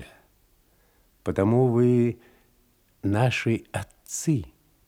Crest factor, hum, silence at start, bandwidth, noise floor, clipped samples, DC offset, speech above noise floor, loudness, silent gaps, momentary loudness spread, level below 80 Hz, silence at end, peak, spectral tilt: 16 dB; none; 0 s; 16 kHz; -63 dBFS; under 0.1%; under 0.1%; 40 dB; -25 LUFS; none; 15 LU; -58 dBFS; 0.4 s; -10 dBFS; -6.5 dB/octave